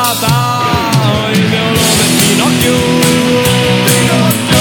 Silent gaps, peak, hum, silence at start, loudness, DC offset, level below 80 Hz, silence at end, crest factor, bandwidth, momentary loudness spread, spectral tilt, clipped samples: none; 0 dBFS; none; 0 s; -9 LUFS; under 0.1%; -36 dBFS; 0 s; 10 dB; over 20 kHz; 3 LU; -4 dB/octave; under 0.1%